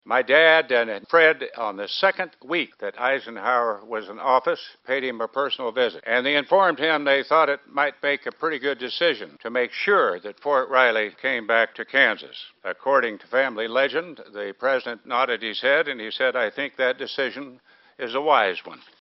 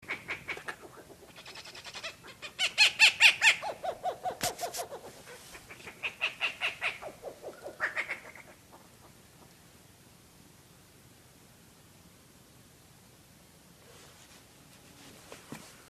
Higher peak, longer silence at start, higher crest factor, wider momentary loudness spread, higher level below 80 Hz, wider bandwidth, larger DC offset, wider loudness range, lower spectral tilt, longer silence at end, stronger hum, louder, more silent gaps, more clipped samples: first, -2 dBFS vs -8 dBFS; about the same, 0.05 s vs 0.05 s; second, 22 dB vs 28 dB; second, 11 LU vs 29 LU; second, -74 dBFS vs -68 dBFS; second, 5.8 kHz vs 14 kHz; neither; second, 3 LU vs 16 LU; about the same, 0.5 dB/octave vs 0 dB/octave; about the same, 0.3 s vs 0.2 s; neither; first, -22 LUFS vs -28 LUFS; neither; neither